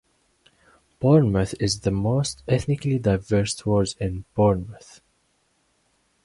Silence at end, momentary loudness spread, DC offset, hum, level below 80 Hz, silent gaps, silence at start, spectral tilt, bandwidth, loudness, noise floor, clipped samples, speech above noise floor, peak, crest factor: 1.45 s; 9 LU; under 0.1%; none; -44 dBFS; none; 1 s; -6.5 dB/octave; 11.5 kHz; -23 LUFS; -67 dBFS; under 0.1%; 46 dB; -6 dBFS; 18 dB